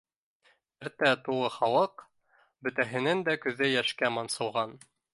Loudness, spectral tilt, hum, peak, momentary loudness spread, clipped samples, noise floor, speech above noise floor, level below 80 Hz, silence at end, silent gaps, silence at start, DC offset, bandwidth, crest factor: -29 LUFS; -4 dB/octave; none; -8 dBFS; 9 LU; under 0.1%; -69 dBFS; 40 dB; -76 dBFS; 0.35 s; none; 0.8 s; under 0.1%; 11.5 kHz; 22 dB